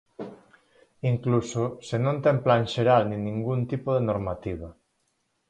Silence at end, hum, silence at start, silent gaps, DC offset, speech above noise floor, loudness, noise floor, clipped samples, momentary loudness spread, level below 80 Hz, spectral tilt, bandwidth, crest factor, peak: 0.75 s; none; 0.2 s; none; under 0.1%; 49 dB; -26 LUFS; -73 dBFS; under 0.1%; 16 LU; -52 dBFS; -7 dB/octave; 9 kHz; 18 dB; -8 dBFS